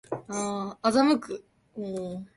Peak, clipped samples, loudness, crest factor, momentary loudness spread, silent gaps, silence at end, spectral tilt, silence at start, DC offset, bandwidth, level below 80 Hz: -10 dBFS; under 0.1%; -27 LUFS; 18 dB; 17 LU; none; 0.1 s; -4.5 dB/octave; 0.1 s; under 0.1%; 11.5 kHz; -66 dBFS